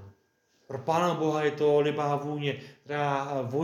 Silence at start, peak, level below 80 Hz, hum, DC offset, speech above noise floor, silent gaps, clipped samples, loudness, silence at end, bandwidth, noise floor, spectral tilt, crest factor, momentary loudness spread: 0 s; -12 dBFS; -78 dBFS; none; under 0.1%; 41 dB; none; under 0.1%; -28 LUFS; 0 s; 14.5 kHz; -69 dBFS; -6.5 dB/octave; 16 dB; 11 LU